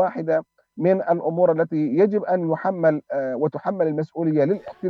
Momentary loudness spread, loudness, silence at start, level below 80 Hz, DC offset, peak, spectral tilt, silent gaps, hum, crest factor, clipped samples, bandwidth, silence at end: 5 LU; -22 LUFS; 0 s; -72 dBFS; under 0.1%; -6 dBFS; -10.5 dB/octave; none; none; 14 dB; under 0.1%; 6.2 kHz; 0 s